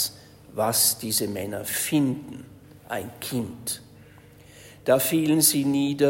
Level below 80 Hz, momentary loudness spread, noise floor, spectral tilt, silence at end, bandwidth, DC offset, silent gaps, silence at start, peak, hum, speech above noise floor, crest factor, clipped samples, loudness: -60 dBFS; 16 LU; -50 dBFS; -3.5 dB/octave; 0 s; 16.5 kHz; under 0.1%; none; 0 s; -4 dBFS; none; 26 dB; 20 dB; under 0.1%; -24 LUFS